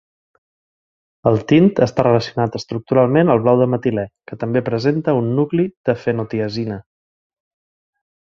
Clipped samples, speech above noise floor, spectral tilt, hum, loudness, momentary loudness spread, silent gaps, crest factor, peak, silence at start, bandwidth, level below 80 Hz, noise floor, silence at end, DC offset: under 0.1%; over 74 dB; -8 dB/octave; none; -17 LUFS; 11 LU; 5.77-5.84 s; 18 dB; 0 dBFS; 1.25 s; 7.4 kHz; -52 dBFS; under -90 dBFS; 1.45 s; under 0.1%